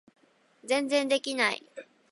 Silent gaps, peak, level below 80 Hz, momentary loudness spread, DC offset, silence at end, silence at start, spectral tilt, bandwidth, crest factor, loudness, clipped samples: none; -10 dBFS; -82 dBFS; 22 LU; under 0.1%; 0.3 s; 0.65 s; -2 dB/octave; 11.5 kHz; 20 dB; -28 LUFS; under 0.1%